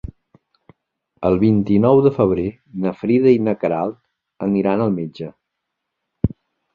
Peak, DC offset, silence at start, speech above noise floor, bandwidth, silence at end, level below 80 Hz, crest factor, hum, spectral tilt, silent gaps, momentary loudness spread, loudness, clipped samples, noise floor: -2 dBFS; under 0.1%; 1.2 s; 61 dB; 5 kHz; 0.45 s; -44 dBFS; 16 dB; none; -10.5 dB/octave; none; 13 LU; -18 LUFS; under 0.1%; -78 dBFS